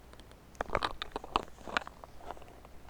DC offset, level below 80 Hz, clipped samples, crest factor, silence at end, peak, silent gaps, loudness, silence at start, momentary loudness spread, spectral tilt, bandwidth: under 0.1%; -52 dBFS; under 0.1%; 30 dB; 0 s; -10 dBFS; none; -38 LUFS; 0 s; 20 LU; -3.5 dB/octave; over 20 kHz